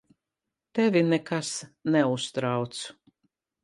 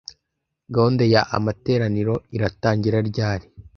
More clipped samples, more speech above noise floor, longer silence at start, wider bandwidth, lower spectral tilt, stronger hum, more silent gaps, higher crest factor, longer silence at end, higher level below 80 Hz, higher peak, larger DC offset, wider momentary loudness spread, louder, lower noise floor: neither; about the same, 61 dB vs 58 dB; about the same, 0.75 s vs 0.7 s; first, 11.5 kHz vs 6.6 kHz; second, -5 dB/octave vs -7.5 dB/octave; neither; neither; about the same, 18 dB vs 20 dB; first, 0.7 s vs 0.15 s; second, -74 dBFS vs -46 dBFS; second, -10 dBFS vs -2 dBFS; neither; first, 11 LU vs 8 LU; second, -27 LUFS vs -21 LUFS; first, -87 dBFS vs -79 dBFS